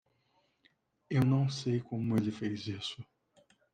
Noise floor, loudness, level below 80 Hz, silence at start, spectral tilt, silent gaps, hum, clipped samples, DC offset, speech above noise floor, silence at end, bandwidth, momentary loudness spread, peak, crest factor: -74 dBFS; -33 LUFS; -72 dBFS; 1.1 s; -7 dB/octave; none; none; under 0.1%; under 0.1%; 42 dB; 0.7 s; 10.5 kHz; 11 LU; -18 dBFS; 16 dB